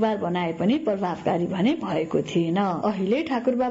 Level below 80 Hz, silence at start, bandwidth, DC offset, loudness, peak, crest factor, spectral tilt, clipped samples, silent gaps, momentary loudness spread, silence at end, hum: -60 dBFS; 0 s; 7.8 kHz; under 0.1%; -24 LUFS; -10 dBFS; 14 dB; -7.5 dB/octave; under 0.1%; none; 3 LU; 0 s; none